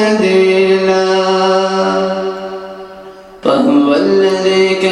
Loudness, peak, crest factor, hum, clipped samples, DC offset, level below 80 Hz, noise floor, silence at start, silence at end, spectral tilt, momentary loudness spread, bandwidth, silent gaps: -12 LUFS; 0 dBFS; 12 dB; none; under 0.1%; under 0.1%; -54 dBFS; -33 dBFS; 0 s; 0 s; -5 dB/octave; 14 LU; 10.5 kHz; none